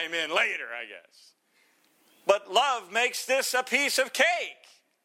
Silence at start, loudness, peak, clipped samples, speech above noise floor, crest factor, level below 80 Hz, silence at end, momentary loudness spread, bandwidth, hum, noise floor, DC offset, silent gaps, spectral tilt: 0 s; -26 LUFS; -6 dBFS; under 0.1%; 39 dB; 24 dB; -86 dBFS; 0.5 s; 12 LU; 17 kHz; none; -66 dBFS; under 0.1%; none; 0 dB/octave